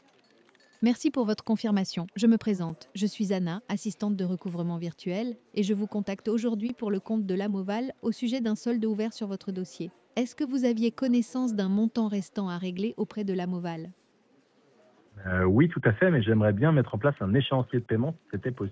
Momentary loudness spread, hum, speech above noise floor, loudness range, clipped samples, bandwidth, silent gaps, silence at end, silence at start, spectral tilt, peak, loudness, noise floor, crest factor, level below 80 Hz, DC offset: 10 LU; none; 37 dB; 6 LU; under 0.1%; 8 kHz; none; 0 s; 0.8 s; -7 dB/octave; -10 dBFS; -28 LUFS; -65 dBFS; 18 dB; -54 dBFS; under 0.1%